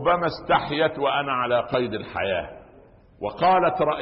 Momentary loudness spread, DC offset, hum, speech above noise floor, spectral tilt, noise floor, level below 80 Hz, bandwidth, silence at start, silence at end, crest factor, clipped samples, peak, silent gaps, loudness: 9 LU; under 0.1%; none; 28 dB; -9.5 dB/octave; -51 dBFS; -52 dBFS; 5.8 kHz; 0 s; 0 s; 14 dB; under 0.1%; -8 dBFS; none; -23 LUFS